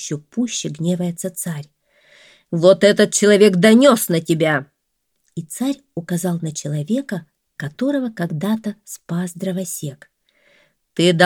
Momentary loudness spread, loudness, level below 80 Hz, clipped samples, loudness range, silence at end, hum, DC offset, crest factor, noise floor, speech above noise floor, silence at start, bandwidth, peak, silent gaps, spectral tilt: 19 LU; -18 LUFS; -66 dBFS; under 0.1%; 10 LU; 0 s; none; under 0.1%; 18 dB; -72 dBFS; 55 dB; 0 s; 18.5 kHz; 0 dBFS; none; -5 dB/octave